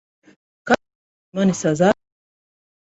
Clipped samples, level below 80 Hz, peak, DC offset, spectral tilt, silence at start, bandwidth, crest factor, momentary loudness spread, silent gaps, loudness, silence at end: under 0.1%; -56 dBFS; -2 dBFS; under 0.1%; -5.5 dB/octave; 0.65 s; 8.2 kHz; 20 dB; 12 LU; 0.95-1.32 s; -20 LUFS; 0.95 s